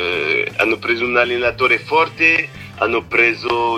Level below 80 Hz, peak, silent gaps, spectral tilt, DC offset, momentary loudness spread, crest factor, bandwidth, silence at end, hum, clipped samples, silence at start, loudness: -48 dBFS; -2 dBFS; none; -4.5 dB/octave; under 0.1%; 6 LU; 16 dB; 15 kHz; 0 s; none; under 0.1%; 0 s; -15 LUFS